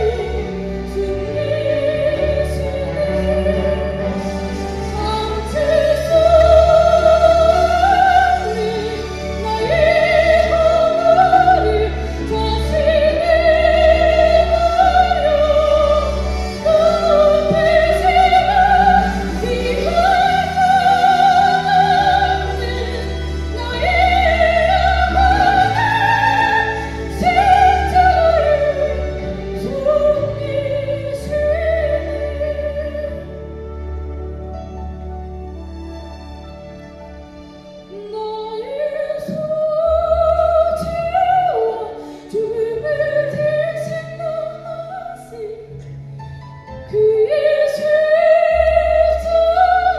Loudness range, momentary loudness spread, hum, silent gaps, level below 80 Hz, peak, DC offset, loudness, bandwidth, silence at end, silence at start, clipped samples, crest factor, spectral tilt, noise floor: 13 LU; 18 LU; none; none; -28 dBFS; 0 dBFS; under 0.1%; -15 LUFS; 12.5 kHz; 0 s; 0 s; under 0.1%; 14 dB; -5.5 dB/octave; -37 dBFS